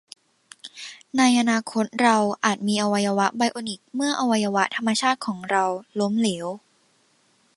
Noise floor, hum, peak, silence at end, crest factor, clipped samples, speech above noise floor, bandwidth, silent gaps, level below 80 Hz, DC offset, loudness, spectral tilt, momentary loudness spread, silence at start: -63 dBFS; none; -4 dBFS; 1 s; 20 dB; under 0.1%; 41 dB; 11.5 kHz; none; -70 dBFS; under 0.1%; -22 LUFS; -4 dB/octave; 14 LU; 0.65 s